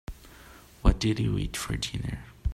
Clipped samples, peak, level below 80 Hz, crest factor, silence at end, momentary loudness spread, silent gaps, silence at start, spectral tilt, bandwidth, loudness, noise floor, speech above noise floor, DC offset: under 0.1%; -8 dBFS; -32 dBFS; 20 dB; 0 s; 23 LU; none; 0.1 s; -5.5 dB/octave; 15.5 kHz; -29 LUFS; -51 dBFS; 22 dB; under 0.1%